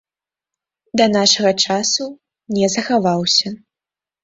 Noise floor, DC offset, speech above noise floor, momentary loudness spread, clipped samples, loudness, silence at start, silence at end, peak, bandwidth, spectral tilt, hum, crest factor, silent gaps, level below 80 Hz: -90 dBFS; under 0.1%; 73 dB; 12 LU; under 0.1%; -16 LUFS; 0.95 s; 0.65 s; 0 dBFS; 8 kHz; -3 dB/octave; none; 18 dB; none; -60 dBFS